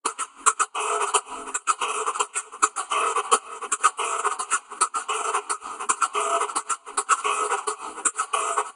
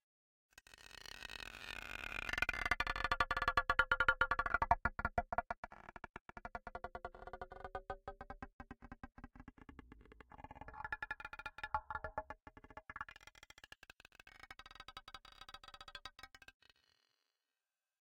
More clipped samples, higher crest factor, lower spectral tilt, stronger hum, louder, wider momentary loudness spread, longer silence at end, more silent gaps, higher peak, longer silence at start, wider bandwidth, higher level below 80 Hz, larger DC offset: neither; about the same, 24 dB vs 28 dB; second, 2.5 dB/octave vs -3.5 dB/octave; neither; first, -24 LUFS vs -40 LUFS; second, 5 LU vs 24 LU; second, 0.05 s vs 1.65 s; second, none vs 5.58-5.63 s, 6.10-6.14 s, 6.21-6.25 s, 8.53-8.59 s; first, -2 dBFS vs -16 dBFS; second, 0.05 s vs 0.75 s; second, 11.5 kHz vs 16.5 kHz; second, -74 dBFS vs -56 dBFS; neither